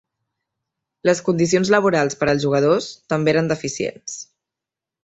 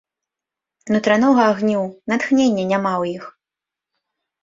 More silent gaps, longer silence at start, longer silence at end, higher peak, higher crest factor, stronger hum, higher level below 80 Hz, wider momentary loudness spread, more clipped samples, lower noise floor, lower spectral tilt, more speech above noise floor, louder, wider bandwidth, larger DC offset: neither; first, 1.05 s vs 0.85 s; second, 0.8 s vs 1.1 s; about the same, -2 dBFS vs -2 dBFS; about the same, 18 dB vs 18 dB; neither; first, -56 dBFS vs -64 dBFS; about the same, 10 LU vs 9 LU; neither; about the same, -87 dBFS vs -87 dBFS; about the same, -5 dB/octave vs -6 dB/octave; about the same, 68 dB vs 70 dB; about the same, -19 LUFS vs -18 LUFS; about the same, 8.2 kHz vs 7.8 kHz; neither